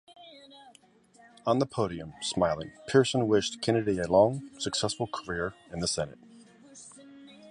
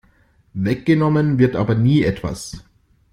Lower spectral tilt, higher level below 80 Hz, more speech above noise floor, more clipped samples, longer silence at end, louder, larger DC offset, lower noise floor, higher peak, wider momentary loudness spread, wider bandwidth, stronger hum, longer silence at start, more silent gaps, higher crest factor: second, -4.5 dB/octave vs -7.5 dB/octave; second, -56 dBFS vs -44 dBFS; second, 32 dB vs 39 dB; neither; second, 0 s vs 0.5 s; second, -29 LUFS vs -18 LUFS; neither; first, -60 dBFS vs -56 dBFS; second, -8 dBFS vs -2 dBFS; second, 13 LU vs 17 LU; about the same, 11.5 kHz vs 12 kHz; neither; second, 0.2 s vs 0.55 s; neither; first, 22 dB vs 16 dB